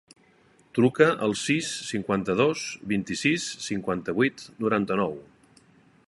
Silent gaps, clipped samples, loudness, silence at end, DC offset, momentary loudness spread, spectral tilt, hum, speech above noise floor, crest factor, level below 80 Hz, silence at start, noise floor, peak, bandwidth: none; under 0.1%; -26 LUFS; 0.85 s; under 0.1%; 9 LU; -4.5 dB/octave; none; 35 dB; 22 dB; -60 dBFS; 0.75 s; -60 dBFS; -4 dBFS; 11.5 kHz